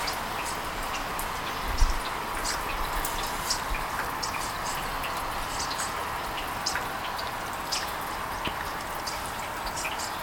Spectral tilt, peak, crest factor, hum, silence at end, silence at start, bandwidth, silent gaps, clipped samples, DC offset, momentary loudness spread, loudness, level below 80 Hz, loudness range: -2 dB/octave; -8 dBFS; 22 dB; none; 0 s; 0 s; 19 kHz; none; under 0.1%; under 0.1%; 3 LU; -31 LUFS; -38 dBFS; 1 LU